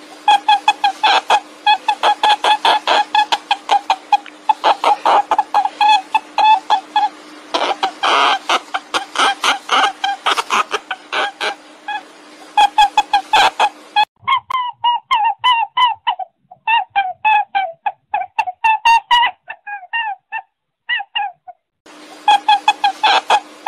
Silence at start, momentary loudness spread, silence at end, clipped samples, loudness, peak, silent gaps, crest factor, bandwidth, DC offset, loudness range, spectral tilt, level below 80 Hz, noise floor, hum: 0 s; 10 LU; 0.25 s; under 0.1%; -15 LUFS; 0 dBFS; 14.08-14.15 s, 21.80-21.85 s; 16 dB; 13.5 kHz; under 0.1%; 3 LU; 0.5 dB/octave; -60 dBFS; -43 dBFS; none